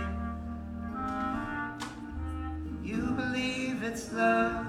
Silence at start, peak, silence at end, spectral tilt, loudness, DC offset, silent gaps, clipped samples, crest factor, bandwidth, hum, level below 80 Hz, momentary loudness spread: 0 s; -14 dBFS; 0 s; -5.5 dB/octave; -33 LUFS; under 0.1%; none; under 0.1%; 18 dB; 14.5 kHz; none; -44 dBFS; 12 LU